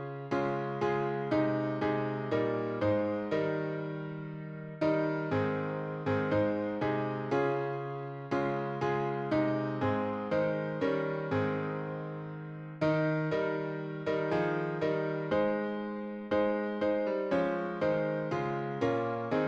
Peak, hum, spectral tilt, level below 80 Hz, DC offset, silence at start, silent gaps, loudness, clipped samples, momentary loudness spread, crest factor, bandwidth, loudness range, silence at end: -18 dBFS; none; -8.5 dB/octave; -66 dBFS; under 0.1%; 0 s; none; -32 LUFS; under 0.1%; 7 LU; 14 dB; 7.4 kHz; 2 LU; 0 s